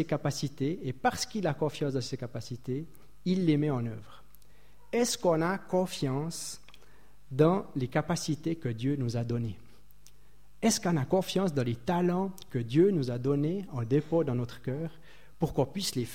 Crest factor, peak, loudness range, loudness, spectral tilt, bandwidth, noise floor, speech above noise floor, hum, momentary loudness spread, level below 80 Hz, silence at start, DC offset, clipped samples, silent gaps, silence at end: 20 dB; -10 dBFS; 4 LU; -31 LUFS; -5.5 dB/octave; 16.5 kHz; -61 dBFS; 31 dB; none; 11 LU; -58 dBFS; 0 s; 0.5%; under 0.1%; none; 0 s